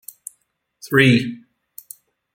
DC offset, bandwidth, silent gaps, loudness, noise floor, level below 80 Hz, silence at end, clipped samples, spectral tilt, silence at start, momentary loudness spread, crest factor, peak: under 0.1%; 17 kHz; none; -17 LUFS; -67 dBFS; -58 dBFS; 1 s; under 0.1%; -5.5 dB/octave; 0.85 s; 25 LU; 20 dB; -2 dBFS